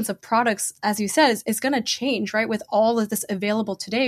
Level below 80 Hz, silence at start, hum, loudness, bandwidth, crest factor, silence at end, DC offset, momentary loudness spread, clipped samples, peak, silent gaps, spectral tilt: -68 dBFS; 0 s; none; -22 LUFS; 15.5 kHz; 16 dB; 0 s; under 0.1%; 6 LU; under 0.1%; -8 dBFS; none; -3.5 dB/octave